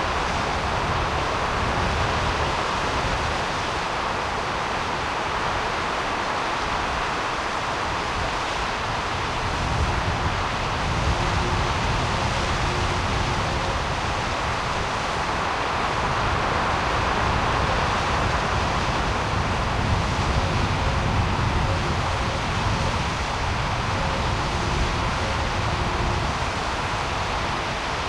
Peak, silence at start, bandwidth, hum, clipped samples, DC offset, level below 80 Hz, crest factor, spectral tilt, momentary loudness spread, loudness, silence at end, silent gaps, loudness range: -8 dBFS; 0 s; 13 kHz; none; under 0.1%; under 0.1%; -32 dBFS; 14 dB; -4.5 dB/octave; 3 LU; -24 LUFS; 0 s; none; 2 LU